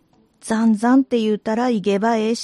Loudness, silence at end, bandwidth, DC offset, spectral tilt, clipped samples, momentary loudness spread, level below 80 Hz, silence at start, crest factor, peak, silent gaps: -18 LUFS; 0 s; 11.5 kHz; under 0.1%; -5.5 dB/octave; under 0.1%; 5 LU; -62 dBFS; 0.45 s; 12 dB; -6 dBFS; none